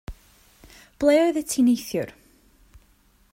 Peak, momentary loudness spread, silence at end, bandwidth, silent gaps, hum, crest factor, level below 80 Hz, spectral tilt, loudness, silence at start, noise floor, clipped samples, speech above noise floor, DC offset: -6 dBFS; 15 LU; 1.2 s; 16.5 kHz; none; none; 18 dB; -50 dBFS; -4.5 dB/octave; -22 LUFS; 0.1 s; -60 dBFS; under 0.1%; 39 dB; under 0.1%